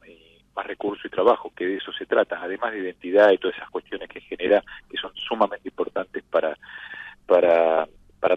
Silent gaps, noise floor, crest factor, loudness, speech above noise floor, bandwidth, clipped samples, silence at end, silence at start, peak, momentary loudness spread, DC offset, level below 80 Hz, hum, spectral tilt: none; -52 dBFS; 18 dB; -23 LUFS; 29 dB; 6 kHz; under 0.1%; 0 s; 0.55 s; -6 dBFS; 17 LU; under 0.1%; -62 dBFS; none; -6 dB/octave